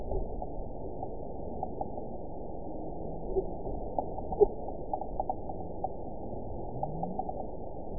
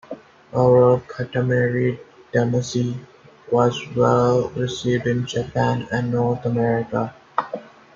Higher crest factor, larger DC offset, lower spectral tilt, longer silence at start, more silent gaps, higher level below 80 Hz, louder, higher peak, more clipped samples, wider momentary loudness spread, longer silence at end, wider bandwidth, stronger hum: first, 26 dB vs 18 dB; first, 1% vs under 0.1%; second, -1 dB/octave vs -7 dB/octave; about the same, 0 s vs 0.1 s; neither; first, -44 dBFS vs -54 dBFS; second, -37 LUFS vs -21 LUFS; second, -10 dBFS vs -4 dBFS; neither; second, 8 LU vs 11 LU; second, 0 s vs 0.3 s; second, 1 kHz vs 7.6 kHz; neither